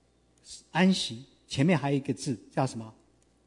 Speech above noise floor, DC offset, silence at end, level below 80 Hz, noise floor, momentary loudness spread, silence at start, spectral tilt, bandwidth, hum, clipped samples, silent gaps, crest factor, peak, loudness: 31 dB; under 0.1%; 0.55 s; -66 dBFS; -60 dBFS; 21 LU; 0.5 s; -5.5 dB/octave; 11 kHz; none; under 0.1%; none; 18 dB; -12 dBFS; -29 LUFS